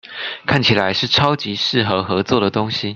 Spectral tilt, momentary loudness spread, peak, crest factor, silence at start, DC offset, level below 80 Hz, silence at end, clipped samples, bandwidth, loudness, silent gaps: -5.5 dB/octave; 5 LU; 0 dBFS; 18 dB; 0.05 s; under 0.1%; -50 dBFS; 0 s; under 0.1%; 8 kHz; -17 LUFS; none